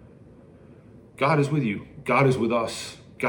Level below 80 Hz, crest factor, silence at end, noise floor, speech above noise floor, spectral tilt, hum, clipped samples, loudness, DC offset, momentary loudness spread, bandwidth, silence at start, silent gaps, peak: -60 dBFS; 18 dB; 0 s; -49 dBFS; 26 dB; -6.5 dB/octave; none; under 0.1%; -24 LUFS; under 0.1%; 12 LU; 17.5 kHz; 0.7 s; none; -6 dBFS